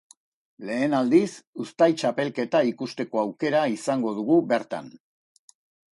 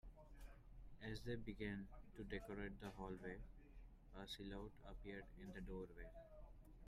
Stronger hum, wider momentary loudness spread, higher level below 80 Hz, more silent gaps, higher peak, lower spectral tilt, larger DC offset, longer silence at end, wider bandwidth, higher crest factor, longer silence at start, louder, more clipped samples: neither; about the same, 13 LU vs 15 LU; second, -72 dBFS vs -60 dBFS; first, 1.47-1.53 s vs none; first, -8 dBFS vs -36 dBFS; about the same, -6 dB/octave vs -6 dB/octave; neither; first, 1.05 s vs 0 s; second, 11.5 kHz vs 15 kHz; about the same, 18 dB vs 18 dB; first, 0.6 s vs 0.05 s; first, -24 LUFS vs -55 LUFS; neither